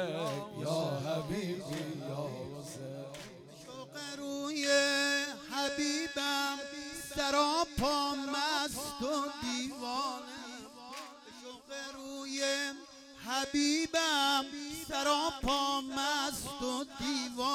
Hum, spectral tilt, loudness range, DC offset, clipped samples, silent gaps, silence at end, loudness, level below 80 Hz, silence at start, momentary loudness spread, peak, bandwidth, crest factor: none; -3 dB/octave; 8 LU; under 0.1%; under 0.1%; none; 0 s; -34 LUFS; -60 dBFS; 0 s; 17 LU; -16 dBFS; 17.5 kHz; 18 dB